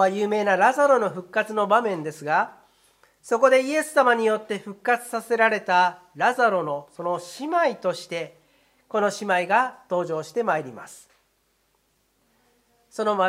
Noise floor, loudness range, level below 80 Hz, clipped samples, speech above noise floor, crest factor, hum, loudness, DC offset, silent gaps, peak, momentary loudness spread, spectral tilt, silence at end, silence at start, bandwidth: -68 dBFS; 5 LU; -76 dBFS; under 0.1%; 46 dB; 20 dB; none; -23 LUFS; under 0.1%; none; -4 dBFS; 12 LU; -4 dB/octave; 0 s; 0 s; 15.5 kHz